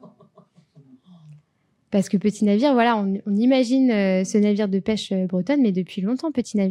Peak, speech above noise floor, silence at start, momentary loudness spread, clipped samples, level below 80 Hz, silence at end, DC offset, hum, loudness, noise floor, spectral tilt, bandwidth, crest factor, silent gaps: -6 dBFS; 47 dB; 0.05 s; 7 LU; under 0.1%; -66 dBFS; 0 s; under 0.1%; none; -21 LUFS; -67 dBFS; -6.5 dB/octave; 11 kHz; 16 dB; none